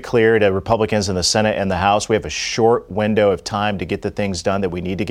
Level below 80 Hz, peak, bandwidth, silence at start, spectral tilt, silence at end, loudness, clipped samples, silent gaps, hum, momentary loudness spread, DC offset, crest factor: -42 dBFS; -2 dBFS; 13.5 kHz; 0 s; -4.5 dB/octave; 0 s; -18 LUFS; under 0.1%; none; none; 7 LU; under 0.1%; 16 dB